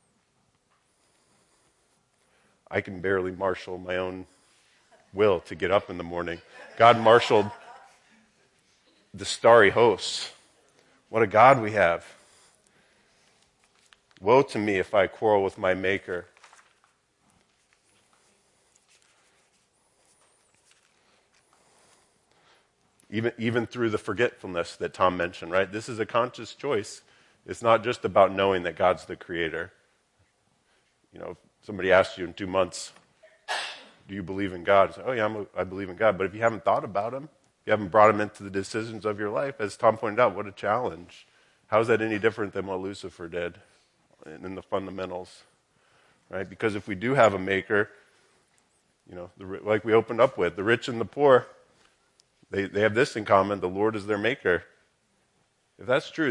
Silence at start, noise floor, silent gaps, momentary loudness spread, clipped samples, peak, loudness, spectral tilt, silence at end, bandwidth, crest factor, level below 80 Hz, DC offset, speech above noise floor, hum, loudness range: 2.7 s; -70 dBFS; none; 18 LU; under 0.1%; -2 dBFS; -25 LUFS; -5 dB/octave; 0 s; 11.5 kHz; 26 dB; -68 dBFS; under 0.1%; 45 dB; none; 9 LU